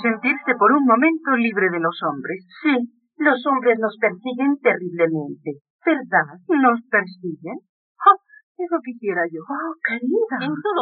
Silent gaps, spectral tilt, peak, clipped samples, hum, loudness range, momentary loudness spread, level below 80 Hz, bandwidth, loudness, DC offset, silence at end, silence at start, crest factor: 5.61-5.79 s, 7.69-7.95 s, 8.43-8.55 s; -4 dB/octave; -2 dBFS; under 0.1%; none; 3 LU; 15 LU; -84 dBFS; 4.6 kHz; -20 LUFS; under 0.1%; 0 s; 0 s; 18 dB